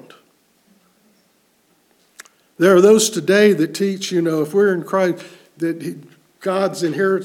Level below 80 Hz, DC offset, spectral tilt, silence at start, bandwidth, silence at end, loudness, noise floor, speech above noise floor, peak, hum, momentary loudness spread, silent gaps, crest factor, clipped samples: -70 dBFS; under 0.1%; -4.5 dB/octave; 2.6 s; 17 kHz; 0 s; -17 LUFS; -60 dBFS; 44 dB; -2 dBFS; none; 15 LU; none; 18 dB; under 0.1%